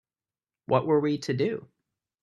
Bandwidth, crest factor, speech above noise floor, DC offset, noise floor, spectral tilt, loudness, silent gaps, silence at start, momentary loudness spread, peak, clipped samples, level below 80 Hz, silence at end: 11 kHz; 22 dB; over 64 dB; under 0.1%; under -90 dBFS; -7 dB/octave; -26 LUFS; none; 0.7 s; 6 LU; -8 dBFS; under 0.1%; -70 dBFS; 0.6 s